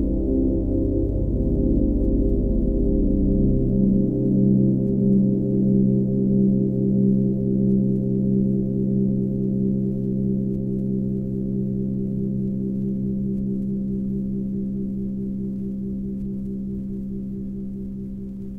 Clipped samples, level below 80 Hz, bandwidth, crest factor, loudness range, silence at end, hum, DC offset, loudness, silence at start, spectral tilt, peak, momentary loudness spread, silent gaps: under 0.1%; -30 dBFS; 1.1 kHz; 14 dB; 8 LU; 0 s; none; under 0.1%; -23 LUFS; 0 s; -14 dB/octave; -8 dBFS; 10 LU; none